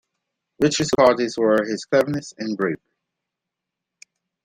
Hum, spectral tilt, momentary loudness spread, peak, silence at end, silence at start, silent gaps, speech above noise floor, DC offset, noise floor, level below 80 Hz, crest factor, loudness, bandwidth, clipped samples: none; -4.5 dB/octave; 10 LU; -2 dBFS; 1.7 s; 0.6 s; none; 64 dB; under 0.1%; -84 dBFS; -58 dBFS; 20 dB; -20 LUFS; 15.5 kHz; under 0.1%